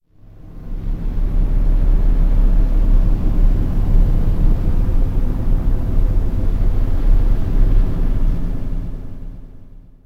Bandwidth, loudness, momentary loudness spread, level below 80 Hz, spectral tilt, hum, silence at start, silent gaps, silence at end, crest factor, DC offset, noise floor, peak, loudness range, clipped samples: 2.5 kHz; -21 LUFS; 12 LU; -14 dBFS; -9.5 dB/octave; none; 0.35 s; none; 0.35 s; 12 dB; under 0.1%; -39 dBFS; -2 dBFS; 3 LU; under 0.1%